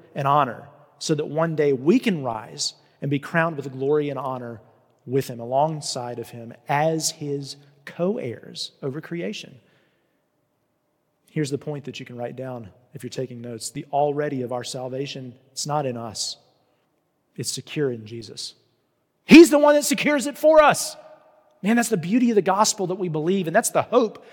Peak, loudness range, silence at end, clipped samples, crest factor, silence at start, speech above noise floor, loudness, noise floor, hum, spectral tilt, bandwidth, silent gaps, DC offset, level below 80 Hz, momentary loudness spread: 0 dBFS; 16 LU; 0.15 s; under 0.1%; 22 dB; 0.15 s; 49 dB; -22 LUFS; -71 dBFS; none; -4.5 dB/octave; 17.5 kHz; none; under 0.1%; -62 dBFS; 17 LU